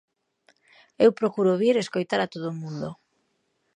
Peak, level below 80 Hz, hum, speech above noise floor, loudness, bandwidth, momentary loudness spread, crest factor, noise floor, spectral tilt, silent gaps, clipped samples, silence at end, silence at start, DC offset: -6 dBFS; -72 dBFS; none; 49 dB; -24 LUFS; 10.5 kHz; 13 LU; 20 dB; -73 dBFS; -6 dB/octave; none; under 0.1%; 0.85 s; 1 s; under 0.1%